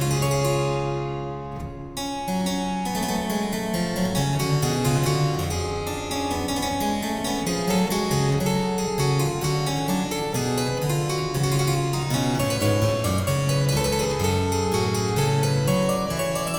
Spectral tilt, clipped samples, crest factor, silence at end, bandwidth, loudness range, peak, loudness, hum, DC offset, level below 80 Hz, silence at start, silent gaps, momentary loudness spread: -5 dB/octave; under 0.1%; 14 dB; 0 s; 19.5 kHz; 3 LU; -10 dBFS; -24 LUFS; none; under 0.1%; -42 dBFS; 0 s; none; 5 LU